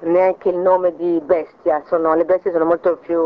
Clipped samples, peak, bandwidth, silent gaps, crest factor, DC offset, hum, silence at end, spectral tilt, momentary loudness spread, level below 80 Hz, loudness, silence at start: under 0.1%; -4 dBFS; 4.9 kHz; none; 14 dB; under 0.1%; none; 0 s; -9.5 dB/octave; 4 LU; -58 dBFS; -17 LUFS; 0 s